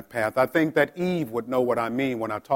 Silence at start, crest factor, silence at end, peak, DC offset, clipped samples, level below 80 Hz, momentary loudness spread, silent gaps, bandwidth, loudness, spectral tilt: 0 s; 18 dB; 0 s; -8 dBFS; under 0.1%; under 0.1%; -64 dBFS; 5 LU; none; 17 kHz; -25 LUFS; -6.5 dB/octave